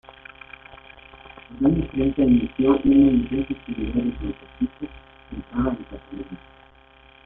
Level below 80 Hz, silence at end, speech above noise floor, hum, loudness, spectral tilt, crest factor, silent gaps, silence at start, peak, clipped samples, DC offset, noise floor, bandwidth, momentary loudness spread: -40 dBFS; 0.9 s; 30 dB; none; -22 LUFS; -11.5 dB/octave; 18 dB; none; 1.15 s; -6 dBFS; under 0.1%; under 0.1%; -52 dBFS; 3.8 kHz; 25 LU